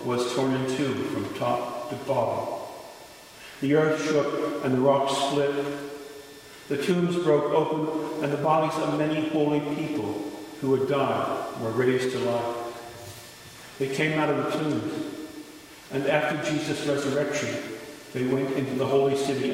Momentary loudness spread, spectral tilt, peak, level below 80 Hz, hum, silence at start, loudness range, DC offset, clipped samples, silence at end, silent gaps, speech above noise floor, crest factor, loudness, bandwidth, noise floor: 17 LU; -5.5 dB/octave; -8 dBFS; -66 dBFS; none; 0 s; 3 LU; under 0.1%; under 0.1%; 0 s; none; 21 dB; 18 dB; -26 LUFS; 16 kHz; -46 dBFS